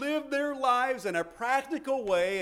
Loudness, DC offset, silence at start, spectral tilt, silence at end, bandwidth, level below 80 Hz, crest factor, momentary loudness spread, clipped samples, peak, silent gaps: -29 LUFS; under 0.1%; 0 s; -4 dB/octave; 0 s; 16 kHz; -64 dBFS; 16 dB; 5 LU; under 0.1%; -14 dBFS; none